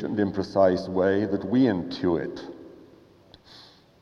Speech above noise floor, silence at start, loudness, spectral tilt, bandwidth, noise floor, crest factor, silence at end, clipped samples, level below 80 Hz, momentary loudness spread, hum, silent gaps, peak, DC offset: 30 dB; 0 s; -24 LUFS; -8 dB/octave; 7 kHz; -54 dBFS; 18 dB; 0.4 s; under 0.1%; -60 dBFS; 16 LU; none; none; -8 dBFS; under 0.1%